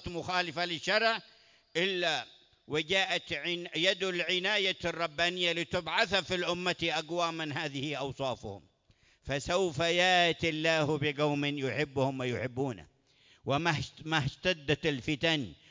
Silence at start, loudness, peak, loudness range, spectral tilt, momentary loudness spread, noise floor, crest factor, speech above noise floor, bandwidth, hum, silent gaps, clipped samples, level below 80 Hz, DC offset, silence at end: 0 s; -31 LUFS; -12 dBFS; 4 LU; -4 dB/octave; 8 LU; -67 dBFS; 20 dB; 35 dB; 7.6 kHz; none; none; under 0.1%; -60 dBFS; under 0.1%; 0.15 s